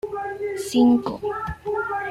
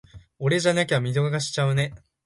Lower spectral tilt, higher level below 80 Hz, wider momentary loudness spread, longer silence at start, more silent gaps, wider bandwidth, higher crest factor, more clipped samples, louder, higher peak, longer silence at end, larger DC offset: about the same, -5.5 dB/octave vs -5 dB/octave; first, -48 dBFS vs -56 dBFS; first, 11 LU vs 6 LU; about the same, 0.05 s vs 0.15 s; neither; first, 14 kHz vs 11.5 kHz; about the same, 16 dB vs 16 dB; neither; about the same, -23 LUFS vs -24 LUFS; about the same, -6 dBFS vs -8 dBFS; second, 0 s vs 0.3 s; neither